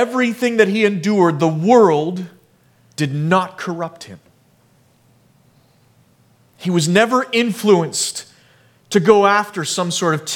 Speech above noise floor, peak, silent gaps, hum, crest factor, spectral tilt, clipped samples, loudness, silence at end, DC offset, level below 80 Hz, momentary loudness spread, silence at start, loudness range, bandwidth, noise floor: 39 dB; 0 dBFS; none; none; 18 dB; -5 dB/octave; under 0.1%; -16 LUFS; 0 s; under 0.1%; -64 dBFS; 15 LU; 0 s; 9 LU; 17.5 kHz; -55 dBFS